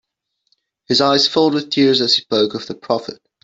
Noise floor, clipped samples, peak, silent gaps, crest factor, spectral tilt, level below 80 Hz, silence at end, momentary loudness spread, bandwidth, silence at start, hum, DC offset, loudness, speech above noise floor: -67 dBFS; under 0.1%; -2 dBFS; none; 16 dB; -4 dB/octave; -60 dBFS; 0.3 s; 9 LU; 8 kHz; 0.9 s; none; under 0.1%; -15 LUFS; 51 dB